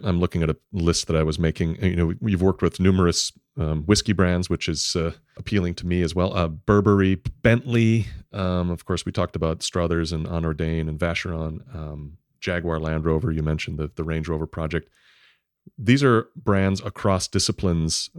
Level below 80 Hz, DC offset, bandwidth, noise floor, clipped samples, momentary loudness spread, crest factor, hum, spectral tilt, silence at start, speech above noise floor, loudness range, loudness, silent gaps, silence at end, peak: -38 dBFS; under 0.1%; 14 kHz; -60 dBFS; under 0.1%; 9 LU; 20 dB; none; -5.5 dB/octave; 0 s; 38 dB; 5 LU; -23 LUFS; none; 0 s; -4 dBFS